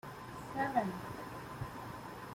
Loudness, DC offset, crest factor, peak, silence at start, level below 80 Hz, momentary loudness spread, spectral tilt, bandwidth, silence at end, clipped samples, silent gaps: -41 LUFS; under 0.1%; 22 dB; -20 dBFS; 0.05 s; -62 dBFS; 12 LU; -6 dB/octave; 16.5 kHz; 0 s; under 0.1%; none